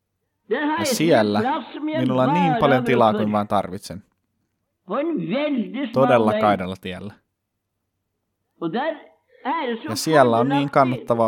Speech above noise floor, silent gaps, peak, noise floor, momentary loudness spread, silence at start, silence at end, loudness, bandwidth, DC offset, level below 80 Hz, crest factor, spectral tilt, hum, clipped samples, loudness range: 57 dB; none; 0 dBFS; -77 dBFS; 15 LU; 0.5 s; 0 s; -20 LUFS; 18 kHz; under 0.1%; -62 dBFS; 20 dB; -5.5 dB/octave; none; under 0.1%; 7 LU